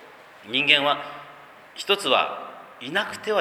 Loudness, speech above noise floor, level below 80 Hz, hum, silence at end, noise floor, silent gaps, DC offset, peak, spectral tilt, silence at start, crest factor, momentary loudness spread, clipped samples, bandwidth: -22 LUFS; 23 dB; -74 dBFS; none; 0 s; -46 dBFS; none; under 0.1%; 0 dBFS; -2.5 dB/octave; 0 s; 24 dB; 21 LU; under 0.1%; 19.5 kHz